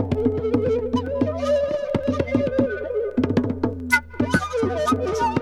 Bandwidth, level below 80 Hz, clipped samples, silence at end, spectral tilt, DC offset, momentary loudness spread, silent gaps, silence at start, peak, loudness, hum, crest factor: 15 kHz; -44 dBFS; under 0.1%; 0 s; -6.5 dB/octave; under 0.1%; 3 LU; none; 0 s; -4 dBFS; -22 LUFS; none; 18 dB